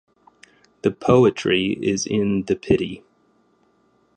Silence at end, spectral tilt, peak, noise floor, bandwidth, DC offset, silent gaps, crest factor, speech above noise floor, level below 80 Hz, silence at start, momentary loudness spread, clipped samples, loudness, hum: 1.2 s; -5.5 dB/octave; -2 dBFS; -62 dBFS; 9.4 kHz; under 0.1%; none; 20 dB; 42 dB; -50 dBFS; 0.85 s; 9 LU; under 0.1%; -20 LUFS; none